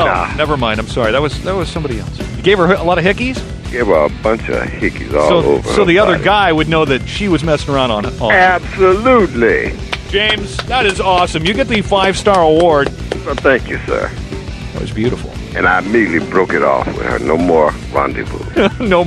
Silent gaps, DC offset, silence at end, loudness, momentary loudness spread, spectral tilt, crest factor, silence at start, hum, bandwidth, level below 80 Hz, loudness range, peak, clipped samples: none; under 0.1%; 0 s; -13 LUFS; 10 LU; -5.5 dB/octave; 14 dB; 0 s; none; 13 kHz; -28 dBFS; 3 LU; 0 dBFS; under 0.1%